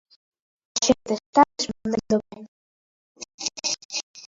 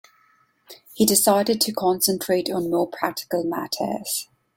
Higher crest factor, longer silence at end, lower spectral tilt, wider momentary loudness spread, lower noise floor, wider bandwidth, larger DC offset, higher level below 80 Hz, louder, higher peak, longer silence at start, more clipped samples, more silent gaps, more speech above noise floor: about the same, 24 dB vs 20 dB; second, 0.1 s vs 0.3 s; about the same, -3 dB/octave vs -3 dB/octave; first, 22 LU vs 10 LU; first, under -90 dBFS vs -61 dBFS; second, 7.8 kHz vs 17 kHz; neither; first, -56 dBFS vs -64 dBFS; about the same, -24 LUFS vs -22 LUFS; about the same, -4 dBFS vs -4 dBFS; about the same, 0.75 s vs 0.7 s; neither; first, 1.26-1.33 s, 2.48-3.15 s, 3.34-3.38 s, 3.85-3.89 s, 4.03-4.14 s vs none; first, over 66 dB vs 39 dB